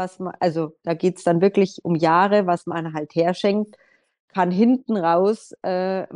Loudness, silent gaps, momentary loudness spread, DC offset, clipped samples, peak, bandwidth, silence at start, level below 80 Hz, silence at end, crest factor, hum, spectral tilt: -21 LUFS; 4.20-4.28 s; 10 LU; under 0.1%; under 0.1%; -4 dBFS; 11 kHz; 0 s; -70 dBFS; 0 s; 16 dB; none; -7 dB/octave